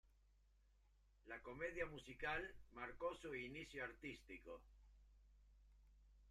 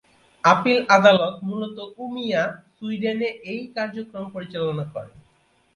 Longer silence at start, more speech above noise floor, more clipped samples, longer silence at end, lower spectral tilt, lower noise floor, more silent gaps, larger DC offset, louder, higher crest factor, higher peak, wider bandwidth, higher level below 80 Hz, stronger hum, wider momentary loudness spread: second, 0.05 s vs 0.45 s; second, 24 dB vs 40 dB; neither; second, 0 s vs 0.65 s; about the same, -5 dB/octave vs -5.5 dB/octave; first, -75 dBFS vs -62 dBFS; neither; neither; second, -51 LUFS vs -22 LUFS; about the same, 22 dB vs 22 dB; second, -32 dBFS vs 0 dBFS; first, 13.5 kHz vs 11 kHz; about the same, -68 dBFS vs -64 dBFS; first, 50 Hz at -70 dBFS vs none; second, 11 LU vs 18 LU